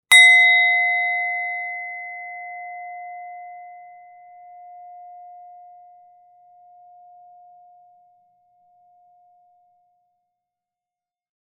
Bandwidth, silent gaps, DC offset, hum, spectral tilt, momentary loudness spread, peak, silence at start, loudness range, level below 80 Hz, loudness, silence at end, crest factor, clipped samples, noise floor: 10.5 kHz; none; under 0.1%; none; 4.5 dB/octave; 30 LU; 0 dBFS; 0.1 s; 28 LU; -82 dBFS; -15 LUFS; 7.85 s; 24 dB; under 0.1%; -90 dBFS